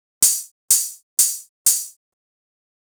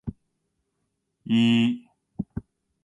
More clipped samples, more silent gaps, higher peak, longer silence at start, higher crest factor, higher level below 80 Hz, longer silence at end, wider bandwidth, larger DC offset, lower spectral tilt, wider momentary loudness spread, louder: neither; first, 0.51-0.68 s, 1.03-1.17 s, 1.49-1.65 s vs none; first, -4 dBFS vs -12 dBFS; first, 0.2 s vs 0.05 s; about the same, 18 dB vs 16 dB; second, -74 dBFS vs -54 dBFS; first, 1 s vs 0.45 s; first, over 20 kHz vs 8.2 kHz; neither; second, 3 dB/octave vs -6.5 dB/octave; second, 7 LU vs 22 LU; first, -18 LUFS vs -24 LUFS